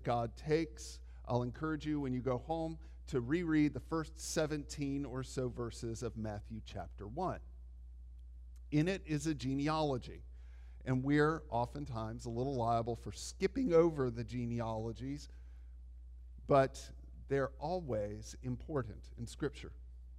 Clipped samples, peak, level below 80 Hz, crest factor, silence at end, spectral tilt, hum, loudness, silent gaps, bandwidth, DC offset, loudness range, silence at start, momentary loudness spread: under 0.1%; -18 dBFS; -52 dBFS; 20 dB; 0 s; -6.5 dB/octave; none; -37 LUFS; none; 13.5 kHz; under 0.1%; 5 LU; 0 s; 23 LU